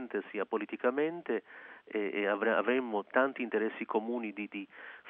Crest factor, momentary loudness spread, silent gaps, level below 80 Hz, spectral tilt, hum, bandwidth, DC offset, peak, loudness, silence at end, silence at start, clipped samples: 20 dB; 11 LU; none; -88 dBFS; -3 dB/octave; none; 3.9 kHz; under 0.1%; -14 dBFS; -34 LUFS; 0 s; 0 s; under 0.1%